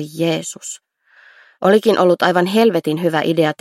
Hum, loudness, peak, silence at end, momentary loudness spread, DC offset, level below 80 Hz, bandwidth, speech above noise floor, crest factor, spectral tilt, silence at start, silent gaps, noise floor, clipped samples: none; -16 LUFS; 0 dBFS; 0.1 s; 15 LU; under 0.1%; -66 dBFS; 15.5 kHz; 34 dB; 16 dB; -5 dB/octave; 0 s; none; -50 dBFS; under 0.1%